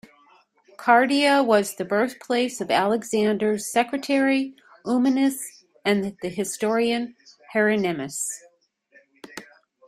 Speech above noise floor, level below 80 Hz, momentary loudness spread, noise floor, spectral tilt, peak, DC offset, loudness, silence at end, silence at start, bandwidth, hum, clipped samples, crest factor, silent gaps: 37 dB; -68 dBFS; 15 LU; -59 dBFS; -4 dB/octave; -2 dBFS; under 0.1%; -23 LUFS; 0.45 s; 0.8 s; 15.5 kHz; none; under 0.1%; 20 dB; none